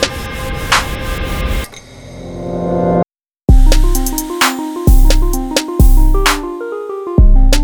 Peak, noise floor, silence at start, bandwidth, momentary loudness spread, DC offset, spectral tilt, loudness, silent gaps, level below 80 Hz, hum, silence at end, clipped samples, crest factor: 0 dBFS; -33 dBFS; 0 s; over 20 kHz; 11 LU; under 0.1%; -4.5 dB/octave; -15 LUFS; none; -12 dBFS; none; 0 s; under 0.1%; 12 dB